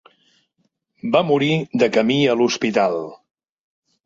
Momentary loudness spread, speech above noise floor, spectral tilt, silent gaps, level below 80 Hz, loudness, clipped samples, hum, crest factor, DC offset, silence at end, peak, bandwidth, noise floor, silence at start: 9 LU; 52 dB; -5.5 dB/octave; none; -64 dBFS; -18 LUFS; under 0.1%; none; 18 dB; under 0.1%; 0.9 s; -2 dBFS; 7.8 kHz; -69 dBFS; 1.05 s